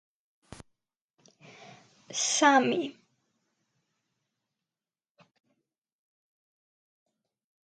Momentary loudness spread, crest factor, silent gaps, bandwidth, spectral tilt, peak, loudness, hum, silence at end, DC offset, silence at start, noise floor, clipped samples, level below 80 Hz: 15 LU; 26 dB; none; 10.5 kHz; -1.5 dB/octave; -10 dBFS; -26 LUFS; none; 4.75 s; under 0.1%; 2.1 s; under -90 dBFS; under 0.1%; -74 dBFS